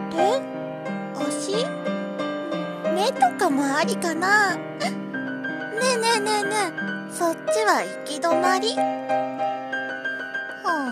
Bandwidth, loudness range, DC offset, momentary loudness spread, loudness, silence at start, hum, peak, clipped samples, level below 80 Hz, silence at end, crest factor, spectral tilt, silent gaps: 14 kHz; 2 LU; under 0.1%; 9 LU; -24 LUFS; 0 s; none; -6 dBFS; under 0.1%; -78 dBFS; 0 s; 18 dB; -3.5 dB/octave; none